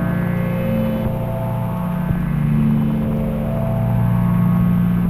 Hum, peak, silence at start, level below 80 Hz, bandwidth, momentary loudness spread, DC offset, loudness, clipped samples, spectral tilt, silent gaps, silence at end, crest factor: none; -6 dBFS; 0 s; -32 dBFS; 14.5 kHz; 6 LU; under 0.1%; -19 LUFS; under 0.1%; -9.5 dB/octave; none; 0 s; 12 dB